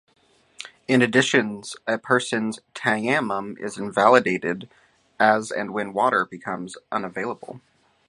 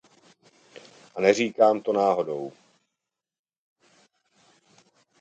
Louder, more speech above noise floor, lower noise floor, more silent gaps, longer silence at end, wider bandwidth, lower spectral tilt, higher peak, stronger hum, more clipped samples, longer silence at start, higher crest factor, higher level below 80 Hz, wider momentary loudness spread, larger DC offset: about the same, -22 LUFS vs -23 LUFS; second, 21 dB vs 63 dB; second, -44 dBFS vs -86 dBFS; neither; second, 0.5 s vs 2.7 s; first, 11.5 kHz vs 9 kHz; about the same, -4.5 dB/octave vs -4.5 dB/octave; first, 0 dBFS vs -4 dBFS; neither; neither; second, 0.6 s vs 1.15 s; about the same, 22 dB vs 24 dB; first, -68 dBFS vs -76 dBFS; about the same, 15 LU vs 16 LU; neither